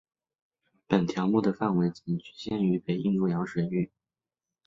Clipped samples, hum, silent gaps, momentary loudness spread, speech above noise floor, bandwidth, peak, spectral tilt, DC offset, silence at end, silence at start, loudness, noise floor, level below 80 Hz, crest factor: under 0.1%; none; none; 8 LU; over 63 dB; 7.6 kHz; -10 dBFS; -8 dB/octave; under 0.1%; 0.8 s; 0.9 s; -28 LUFS; under -90 dBFS; -64 dBFS; 20 dB